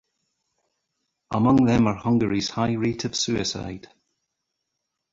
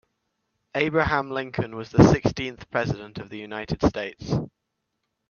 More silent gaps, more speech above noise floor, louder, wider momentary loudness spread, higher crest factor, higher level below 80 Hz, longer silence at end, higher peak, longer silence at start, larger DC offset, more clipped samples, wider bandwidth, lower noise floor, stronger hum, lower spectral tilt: neither; about the same, 59 dB vs 56 dB; about the same, -23 LUFS vs -24 LUFS; second, 13 LU vs 16 LU; about the same, 20 dB vs 24 dB; second, -50 dBFS vs -44 dBFS; first, 1.35 s vs 0.85 s; second, -6 dBFS vs 0 dBFS; first, 1.3 s vs 0.75 s; neither; neither; about the same, 7.8 kHz vs 7.2 kHz; about the same, -81 dBFS vs -79 dBFS; neither; second, -5.5 dB/octave vs -7 dB/octave